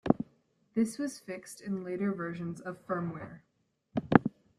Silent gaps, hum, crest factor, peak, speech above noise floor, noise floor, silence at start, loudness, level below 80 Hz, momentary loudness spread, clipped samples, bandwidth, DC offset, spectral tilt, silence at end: none; none; 32 dB; -2 dBFS; 33 dB; -68 dBFS; 0.05 s; -33 LUFS; -64 dBFS; 16 LU; under 0.1%; 13.5 kHz; under 0.1%; -7 dB/octave; 0.3 s